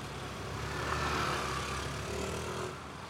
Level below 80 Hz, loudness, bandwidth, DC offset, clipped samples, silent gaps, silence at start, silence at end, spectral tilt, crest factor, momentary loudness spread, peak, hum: -48 dBFS; -36 LUFS; 16 kHz; under 0.1%; under 0.1%; none; 0 s; 0 s; -4 dB/octave; 16 dB; 8 LU; -20 dBFS; none